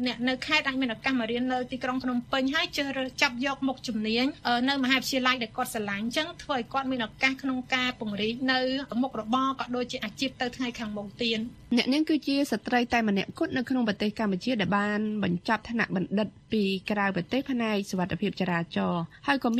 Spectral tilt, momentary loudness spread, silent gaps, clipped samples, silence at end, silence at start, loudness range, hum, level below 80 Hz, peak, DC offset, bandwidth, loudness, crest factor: -4.5 dB/octave; 6 LU; none; under 0.1%; 0 s; 0 s; 2 LU; none; -58 dBFS; -6 dBFS; under 0.1%; 14 kHz; -28 LUFS; 22 dB